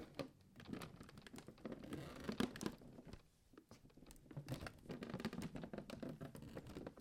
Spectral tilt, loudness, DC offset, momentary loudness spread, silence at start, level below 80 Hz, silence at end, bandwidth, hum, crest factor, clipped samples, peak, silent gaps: -5.5 dB/octave; -52 LUFS; under 0.1%; 18 LU; 0 s; -68 dBFS; 0 s; 16.5 kHz; none; 28 dB; under 0.1%; -24 dBFS; none